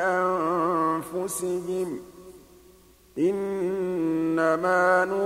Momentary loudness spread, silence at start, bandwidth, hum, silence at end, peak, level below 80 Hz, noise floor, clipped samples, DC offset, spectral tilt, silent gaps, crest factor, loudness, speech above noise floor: 9 LU; 0 s; 16 kHz; none; 0 s; -8 dBFS; -62 dBFS; -55 dBFS; under 0.1%; under 0.1%; -5.5 dB/octave; none; 16 dB; -25 LUFS; 30 dB